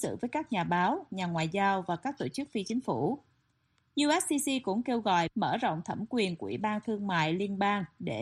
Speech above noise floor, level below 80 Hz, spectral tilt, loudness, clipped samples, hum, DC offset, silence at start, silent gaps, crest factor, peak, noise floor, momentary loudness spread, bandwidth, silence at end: 42 dB; -68 dBFS; -4.5 dB/octave; -31 LUFS; under 0.1%; none; under 0.1%; 0 s; none; 16 dB; -14 dBFS; -73 dBFS; 7 LU; 13 kHz; 0 s